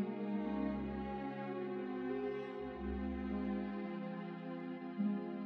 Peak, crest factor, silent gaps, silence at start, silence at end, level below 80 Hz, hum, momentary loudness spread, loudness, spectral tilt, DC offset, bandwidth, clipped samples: -26 dBFS; 14 dB; none; 0 s; 0 s; -56 dBFS; none; 6 LU; -42 LUFS; -9.5 dB/octave; under 0.1%; 5.2 kHz; under 0.1%